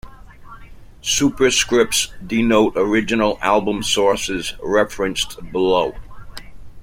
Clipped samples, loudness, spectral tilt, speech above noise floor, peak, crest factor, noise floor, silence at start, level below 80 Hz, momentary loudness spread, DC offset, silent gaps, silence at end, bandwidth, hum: under 0.1%; -18 LUFS; -3 dB/octave; 21 dB; -2 dBFS; 16 dB; -39 dBFS; 0.05 s; -40 dBFS; 10 LU; under 0.1%; none; 0 s; 16.5 kHz; none